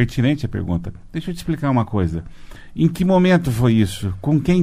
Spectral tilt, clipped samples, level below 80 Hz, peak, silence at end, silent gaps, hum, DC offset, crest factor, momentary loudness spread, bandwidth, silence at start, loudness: -7.5 dB/octave; under 0.1%; -38 dBFS; -2 dBFS; 0 s; none; none; under 0.1%; 16 dB; 12 LU; 15 kHz; 0 s; -19 LUFS